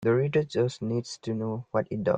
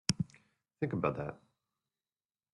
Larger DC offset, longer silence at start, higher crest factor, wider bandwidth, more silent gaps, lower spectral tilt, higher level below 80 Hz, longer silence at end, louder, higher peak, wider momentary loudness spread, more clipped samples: neither; about the same, 0 s vs 0.1 s; second, 16 dB vs 30 dB; second, 9.4 kHz vs 11.5 kHz; neither; first, -7 dB/octave vs -4.5 dB/octave; about the same, -64 dBFS vs -66 dBFS; second, 0 s vs 1.2 s; first, -29 LUFS vs -37 LUFS; about the same, -10 dBFS vs -10 dBFS; about the same, 7 LU vs 8 LU; neither